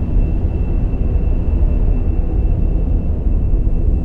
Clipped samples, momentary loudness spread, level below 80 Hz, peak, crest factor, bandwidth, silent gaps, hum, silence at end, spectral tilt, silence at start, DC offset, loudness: under 0.1%; 2 LU; -14 dBFS; -4 dBFS; 10 dB; 2.9 kHz; none; none; 0 s; -11.5 dB/octave; 0 s; under 0.1%; -19 LUFS